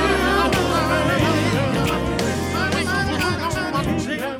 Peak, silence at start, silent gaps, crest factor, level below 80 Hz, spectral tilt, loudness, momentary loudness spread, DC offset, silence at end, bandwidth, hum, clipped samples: -6 dBFS; 0 s; none; 14 dB; -34 dBFS; -5 dB/octave; -20 LUFS; 5 LU; under 0.1%; 0 s; 19 kHz; none; under 0.1%